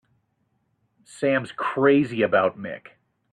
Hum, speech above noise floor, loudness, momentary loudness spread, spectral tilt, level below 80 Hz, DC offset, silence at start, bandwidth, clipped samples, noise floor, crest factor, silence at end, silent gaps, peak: none; 49 dB; -22 LUFS; 16 LU; -6.5 dB/octave; -68 dBFS; under 0.1%; 1.15 s; 10.5 kHz; under 0.1%; -71 dBFS; 20 dB; 0.55 s; none; -6 dBFS